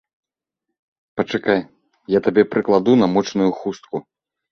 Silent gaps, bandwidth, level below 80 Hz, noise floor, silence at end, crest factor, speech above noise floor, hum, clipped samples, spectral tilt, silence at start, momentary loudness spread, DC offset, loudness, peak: none; 6.6 kHz; -58 dBFS; -81 dBFS; 0.5 s; 18 dB; 64 dB; none; under 0.1%; -6.5 dB/octave; 1.15 s; 14 LU; under 0.1%; -18 LUFS; -2 dBFS